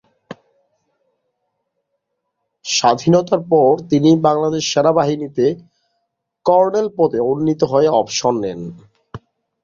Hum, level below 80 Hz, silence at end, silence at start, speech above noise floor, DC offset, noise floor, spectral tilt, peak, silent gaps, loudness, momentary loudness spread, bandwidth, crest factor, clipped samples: none; -56 dBFS; 0.45 s; 0.3 s; 59 dB; under 0.1%; -74 dBFS; -5.5 dB/octave; 0 dBFS; none; -16 LUFS; 9 LU; 7.6 kHz; 16 dB; under 0.1%